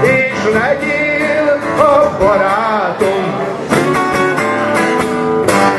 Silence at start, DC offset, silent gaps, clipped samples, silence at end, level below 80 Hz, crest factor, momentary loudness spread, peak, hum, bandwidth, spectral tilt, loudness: 0 s; under 0.1%; none; under 0.1%; 0 s; -42 dBFS; 12 dB; 4 LU; 0 dBFS; none; 12.5 kHz; -5 dB/octave; -13 LUFS